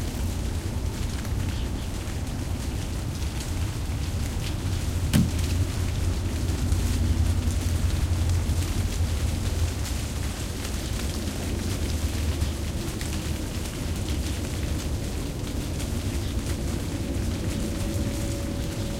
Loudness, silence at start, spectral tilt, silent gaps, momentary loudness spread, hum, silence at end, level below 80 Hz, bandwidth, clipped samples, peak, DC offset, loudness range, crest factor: -29 LUFS; 0 s; -5.5 dB/octave; none; 5 LU; none; 0 s; -30 dBFS; 16.5 kHz; under 0.1%; -6 dBFS; under 0.1%; 4 LU; 20 dB